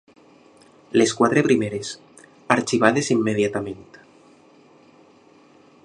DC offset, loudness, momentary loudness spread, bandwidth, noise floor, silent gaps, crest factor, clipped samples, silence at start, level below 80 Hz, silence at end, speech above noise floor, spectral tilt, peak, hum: under 0.1%; -20 LUFS; 16 LU; 11 kHz; -53 dBFS; none; 24 dB; under 0.1%; 0.95 s; -62 dBFS; 2.05 s; 33 dB; -5 dB/octave; 0 dBFS; none